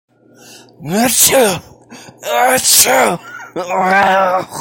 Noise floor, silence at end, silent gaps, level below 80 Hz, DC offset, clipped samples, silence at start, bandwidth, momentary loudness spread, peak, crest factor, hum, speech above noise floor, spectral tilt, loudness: -41 dBFS; 0 s; none; -52 dBFS; under 0.1%; under 0.1%; 0.8 s; 17 kHz; 17 LU; 0 dBFS; 14 dB; none; 29 dB; -1.5 dB/octave; -11 LUFS